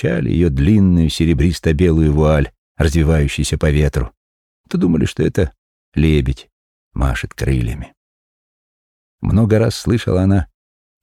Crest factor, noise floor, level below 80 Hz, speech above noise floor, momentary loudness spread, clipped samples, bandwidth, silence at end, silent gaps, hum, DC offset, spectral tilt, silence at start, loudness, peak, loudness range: 14 dB; under -90 dBFS; -26 dBFS; over 75 dB; 11 LU; under 0.1%; 13.5 kHz; 0.6 s; 2.58-2.75 s, 4.17-4.64 s, 5.58-5.92 s, 6.52-6.91 s, 7.97-9.18 s; none; under 0.1%; -7 dB/octave; 0 s; -16 LUFS; -2 dBFS; 6 LU